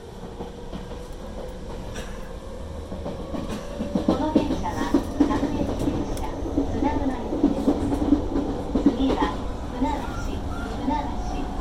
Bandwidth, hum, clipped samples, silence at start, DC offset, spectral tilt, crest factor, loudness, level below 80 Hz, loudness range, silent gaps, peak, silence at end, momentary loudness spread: 14 kHz; none; under 0.1%; 0 s; under 0.1%; -7 dB/octave; 20 dB; -26 LUFS; -34 dBFS; 10 LU; none; -6 dBFS; 0 s; 14 LU